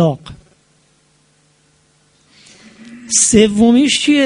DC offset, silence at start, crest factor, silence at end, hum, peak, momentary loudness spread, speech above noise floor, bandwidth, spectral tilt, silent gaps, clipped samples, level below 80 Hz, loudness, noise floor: under 0.1%; 0 s; 16 dB; 0 s; none; 0 dBFS; 7 LU; 44 dB; 11 kHz; -3.5 dB/octave; none; under 0.1%; -46 dBFS; -11 LUFS; -55 dBFS